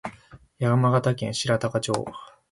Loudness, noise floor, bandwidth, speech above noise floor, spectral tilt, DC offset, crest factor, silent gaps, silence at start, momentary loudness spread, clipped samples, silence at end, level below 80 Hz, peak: -24 LUFS; -51 dBFS; 11.5 kHz; 27 dB; -5.5 dB/octave; under 0.1%; 18 dB; none; 0.05 s; 17 LU; under 0.1%; 0.25 s; -58 dBFS; -8 dBFS